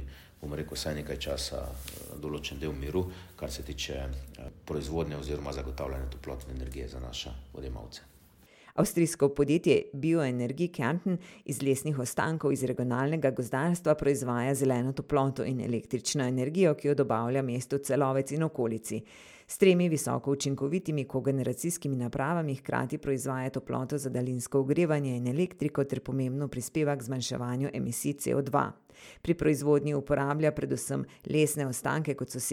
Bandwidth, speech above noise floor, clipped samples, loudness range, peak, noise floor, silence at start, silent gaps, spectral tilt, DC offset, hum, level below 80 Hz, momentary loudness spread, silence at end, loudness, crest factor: 17 kHz; 28 dB; under 0.1%; 8 LU; -10 dBFS; -58 dBFS; 0 s; none; -5.5 dB/octave; under 0.1%; none; -48 dBFS; 13 LU; 0 s; -31 LUFS; 20 dB